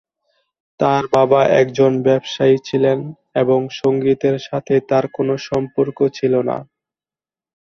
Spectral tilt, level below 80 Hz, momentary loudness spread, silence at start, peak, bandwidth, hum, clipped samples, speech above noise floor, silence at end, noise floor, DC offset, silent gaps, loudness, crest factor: -7 dB/octave; -56 dBFS; 7 LU; 0.8 s; 0 dBFS; 7 kHz; none; under 0.1%; over 74 dB; 1.1 s; under -90 dBFS; under 0.1%; none; -17 LUFS; 16 dB